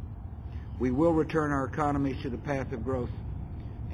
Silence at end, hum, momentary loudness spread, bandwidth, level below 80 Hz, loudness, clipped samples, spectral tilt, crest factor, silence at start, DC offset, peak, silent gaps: 0 s; none; 15 LU; 10 kHz; -42 dBFS; -30 LUFS; under 0.1%; -8.5 dB/octave; 18 dB; 0 s; under 0.1%; -14 dBFS; none